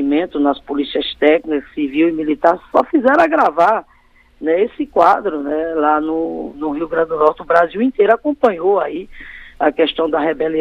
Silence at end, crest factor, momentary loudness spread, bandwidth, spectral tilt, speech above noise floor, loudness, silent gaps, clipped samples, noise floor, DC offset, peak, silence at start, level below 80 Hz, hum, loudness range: 0 s; 16 dB; 9 LU; 7.4 kHz; -6 dB/octave; 35 dB; -16 LUFS; none; under 0.1%; -50 dBFS; under 0.1%; 0 dBFS; 0 s; -48 dBFS; none; 2 LU